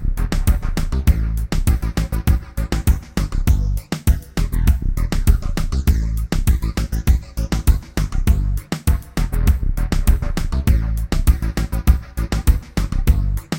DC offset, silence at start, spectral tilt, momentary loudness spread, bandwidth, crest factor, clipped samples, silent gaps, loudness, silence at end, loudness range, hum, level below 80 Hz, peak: under 0.1%; 0 s; -6 dB/octave; 4 LU; 17 kHz; 16 dB; under 0.1%; none; -21 LUFS; 0 s; 1 LU; none; -18 dBFS; -2 dBFS